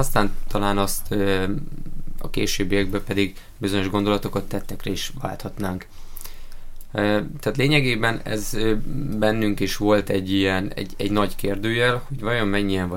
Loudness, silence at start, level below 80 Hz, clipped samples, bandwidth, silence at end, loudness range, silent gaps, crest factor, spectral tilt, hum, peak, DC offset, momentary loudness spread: -23 LUFS; 0 s; -32 dBFS; under 0.1%; 17 kHz; 0 s; 5 LU; none; 20 dB; -5 dB/octave; none; -2 dBFS; under 0.1%; 11 LU